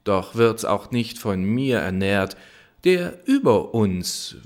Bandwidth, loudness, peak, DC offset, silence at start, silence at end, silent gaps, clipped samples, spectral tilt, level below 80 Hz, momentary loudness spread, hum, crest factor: 17 kHz; -22 LUFS; -4 dBFS; under 0.1%; 0.05 s; 0.1 s; none; under 0.1%; -5.5 dB/octave; -54 dBFS; 7 LU; none; 16 dB